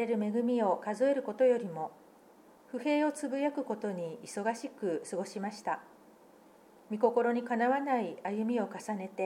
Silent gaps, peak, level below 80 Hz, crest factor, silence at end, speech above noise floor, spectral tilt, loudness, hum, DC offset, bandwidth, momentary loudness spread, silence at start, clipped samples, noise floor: none; -14 dBFS; -86 dBFS; 18 dB; 0 s; 27 dB; -5.5 dB/octave; -33 LUFS; none; under 0.1%; 13.5 kHz; 11 LU; 0 s; under 0.1%; -59 dBFS